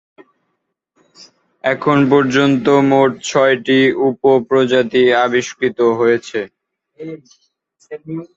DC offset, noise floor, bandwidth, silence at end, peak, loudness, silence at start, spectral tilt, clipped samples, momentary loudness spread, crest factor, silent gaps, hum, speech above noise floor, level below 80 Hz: under 0.1%; -72 dBFS; 7.8 kHz; 0.1 s; -2 dBFS; -14 LUFS; 1.2 s; -5.5 dB/octave; under 0.1%; 19 LU; 14 dB; none; none; 58 dB; -58 dBFS